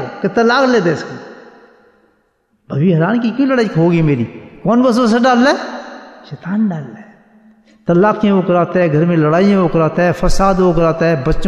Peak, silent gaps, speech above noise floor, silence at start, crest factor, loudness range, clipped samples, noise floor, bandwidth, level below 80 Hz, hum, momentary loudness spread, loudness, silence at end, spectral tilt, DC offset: -2 dBFS; none; 48 dB; 0 s; 12 dB; 4 LU; under 0.1%; -60 dBFS; 11 kHz; -30 dBFS; none; 15 LU; -13 LUFS; 0 s; -7 dB/octave; under 0.1%